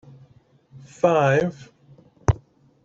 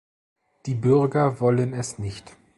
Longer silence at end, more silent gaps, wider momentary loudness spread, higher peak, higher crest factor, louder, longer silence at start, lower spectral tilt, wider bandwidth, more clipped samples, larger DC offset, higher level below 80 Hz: first, 0.5 s vs 0.3 s; neither; second, 11 LU vs 15 LU; first, -2 dBFS vs -6 dBFS; first, 22 dB vs 16 dB; about the same, -22 LUFS vs -22 LUFS; about the same, 0.75 s vs 0.65 s; about the same, -7 dB/octave vs -7 dB/octave; second, 7.8 kHz vs 11.5 kHz; neither; neither; first, -42 dBFS vs -54 dBFS